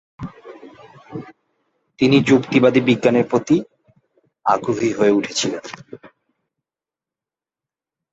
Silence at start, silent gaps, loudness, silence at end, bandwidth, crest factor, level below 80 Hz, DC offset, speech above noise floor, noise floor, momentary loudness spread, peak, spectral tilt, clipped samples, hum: 0.2 s; none; -17 LUFS; 2.05 s; 8 kHz; 20 dB; -58 dBFS; under 0.1%; 73 dB; -90 dBFS; 21 LU; -2 dBFS; -5.5 dB/octave; under 0.1%; none